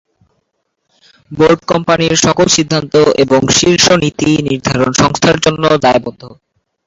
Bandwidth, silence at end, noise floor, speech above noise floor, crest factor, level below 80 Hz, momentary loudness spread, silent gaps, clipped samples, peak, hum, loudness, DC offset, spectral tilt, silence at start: 8 kHz; 0.55 s; -67 dBFS; 57 dB; 12 dB; -40 dBFS; 5 LU; none; under 0.1%; 0 dBFS; none; -10 LUFS; under 0.1%; -4 dB/octave; 1.3 s